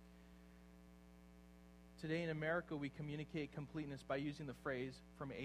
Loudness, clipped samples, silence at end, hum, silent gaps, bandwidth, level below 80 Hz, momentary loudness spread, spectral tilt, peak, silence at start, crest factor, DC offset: -46 LUFS; under 0.1%; 0 s; 60 Hz at -65 dBFS; none; 14.5 kHz; -68 dBFS; 22 LU; -7 dB/octave; -28 dBFS; 0 s; 18 dB; under 0.1%